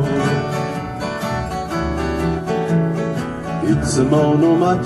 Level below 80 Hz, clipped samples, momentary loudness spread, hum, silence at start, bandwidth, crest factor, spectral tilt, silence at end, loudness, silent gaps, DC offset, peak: -34 dBFS; under 0.1%; 10 LU; none; 0 s; 13 kHz; 14 dB; -6.5 dB/octave; 0 s; -19 LUFS; none; under 0.1%; -4 dBFS